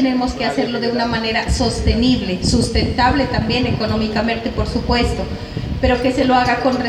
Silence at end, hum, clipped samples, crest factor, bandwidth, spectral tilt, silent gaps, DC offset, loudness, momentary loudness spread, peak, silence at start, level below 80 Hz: 0 s; none; under 0.1%; 14 dB; 12.5 kHz; -5.5 dB/octave; none; under 0.1%; -17 LUFS; 6 LU; -2 dBFS; 0 s; -28 dBFS